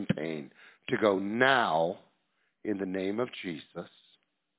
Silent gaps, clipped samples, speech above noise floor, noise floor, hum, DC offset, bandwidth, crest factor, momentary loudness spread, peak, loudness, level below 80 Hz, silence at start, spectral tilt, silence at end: none; under 0.1%; 46 dB; -76 dBFS; none; under 0.1%; 4 kHz; 24 dB; 20 LU; -8 dBFS; -30 LUFS; -68 dBFS; 0 s; -3.5 dB/octave; 0.7 s